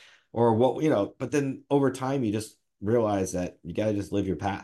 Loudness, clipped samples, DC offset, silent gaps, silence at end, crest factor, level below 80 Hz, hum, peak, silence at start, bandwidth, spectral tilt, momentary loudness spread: -27 LUFS; under 0.1%; under 0.1%; none; 0 s; 16 dB; -62 dBFS; none; -10 dBFS; 0.35 s; 12.5 kHz; -6.5 dB/octave; 10 LU